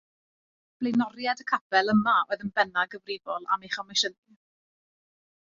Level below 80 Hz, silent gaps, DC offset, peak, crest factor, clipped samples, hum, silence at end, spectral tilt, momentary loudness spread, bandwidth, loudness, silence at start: -70 dBFS; 1.61-1.70 s; under 0.1%; -8 dBFS; 20 dB; under 0.1%; none; 1.45 s; -3.5 dB/octave; 10 LU; 7.8 kHz; -27 LUFS; 0.8 s